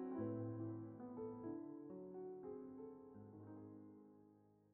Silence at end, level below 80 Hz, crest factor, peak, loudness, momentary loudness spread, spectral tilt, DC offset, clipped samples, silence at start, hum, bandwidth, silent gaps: 0 s; -84 dBFS; 16 dB; -34 dBFS; -52 LUFS; 14 LU; -8.5 dB/octave; under 0.1%; under 0.1%; 0 s; none; 3 kHz; none